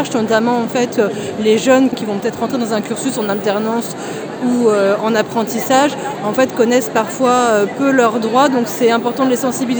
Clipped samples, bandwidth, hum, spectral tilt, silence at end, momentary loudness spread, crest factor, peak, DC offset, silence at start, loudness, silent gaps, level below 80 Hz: under 0.1%; over 20 kHz; none; -4.5 dB/octave; 0 s; 6 LU; 14 dB; 0 dBFS; under 0.1%; 0 s; -15 LUFS; none; -60 dBFS